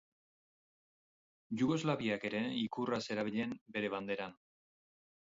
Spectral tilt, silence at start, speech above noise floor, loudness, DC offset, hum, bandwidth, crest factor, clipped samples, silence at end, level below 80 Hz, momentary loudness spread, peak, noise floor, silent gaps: -4.5 dB/octave; 1.5 s; over 53 dB; -37 LUFS; under 0.1%; none; 7.6 kHz; 20 dB; under 0.1%; 1 s; -76 dBFS; 7 LU; -20 dBFS; under -90 dBFS; 3.61-3.66 s